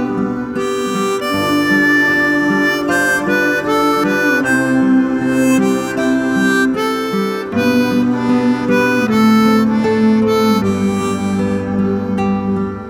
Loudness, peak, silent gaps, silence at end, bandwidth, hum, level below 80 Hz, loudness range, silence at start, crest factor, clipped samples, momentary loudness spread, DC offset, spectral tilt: -14 LUFS; -2 dBFS; none; 0 s; 16 kHz; none; -44 dBFS; 2 LU; 0 s; 12 dB; under 0.1%; 6 LU; under 0.1%; -5.5 dB/octave